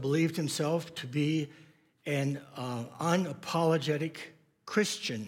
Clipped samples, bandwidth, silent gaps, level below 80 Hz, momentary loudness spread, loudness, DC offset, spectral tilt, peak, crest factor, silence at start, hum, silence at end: under 0.1%; 16.5 kHz; none; -82 dBFS; 11 LU; -32 LUFS; under 0.1%; -5.5 dB/octave; -14 dBFS; 18 dB; 0 s; none; 0 s